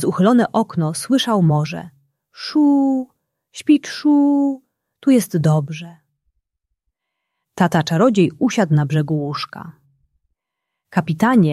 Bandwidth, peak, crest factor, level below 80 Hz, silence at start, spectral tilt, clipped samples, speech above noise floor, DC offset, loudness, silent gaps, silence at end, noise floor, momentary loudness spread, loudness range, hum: 14.5 kHz; -2 dBFS; 16 dB; -60 dBFS; 0 s; -6.5 dB/octave; under 0.1%; 64 dB; under 0.1%; -17 LUFS; none; 0 s; -80 dBFS; 15 LU; 3 LU; none